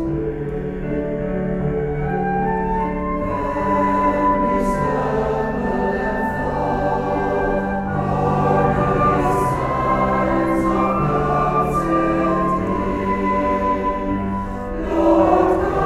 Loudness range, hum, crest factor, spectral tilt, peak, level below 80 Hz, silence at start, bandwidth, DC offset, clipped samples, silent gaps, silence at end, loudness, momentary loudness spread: 3 LU; none; 16 dB; -8 dB/octave; -4 dBFS; -32 dBFS; 0 s; 13.5 kHz; under 0.1%; under 0.1%; none; 0 s; -19 LUFS; 6 LU